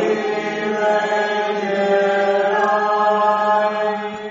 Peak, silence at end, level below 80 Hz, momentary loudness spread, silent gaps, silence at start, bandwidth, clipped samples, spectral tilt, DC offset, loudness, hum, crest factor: -4 dBFS; 0 s; -66 dBFS; 6 LU; none; 0 s; 8 kHz; under 0.1%; -2.5 dB/octave; under 0.1%; -18 LUFS; none; 14 dB